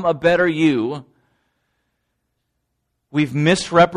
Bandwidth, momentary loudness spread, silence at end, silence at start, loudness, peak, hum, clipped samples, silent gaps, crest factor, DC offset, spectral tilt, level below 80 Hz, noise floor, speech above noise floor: 11.5 kHz; 10 LU; 0 s; 0 s; -18 LUFS; -2 dBFS; none; under 0.1%; none; 18 dB; under 0.1%; -5.5 dB/octave; -52 dBFS; -74 dBFS; 57 dB